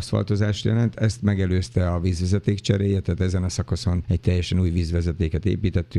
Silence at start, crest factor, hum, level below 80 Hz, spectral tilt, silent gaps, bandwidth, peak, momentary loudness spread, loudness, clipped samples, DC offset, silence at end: 0 s; 16 dB; none; -36 dBFS; -7 dB/octave; none; 11 kHz; -4 dBFS; 3 LU; -23 LUFS; under 0.1%; under 0.1%; 0 s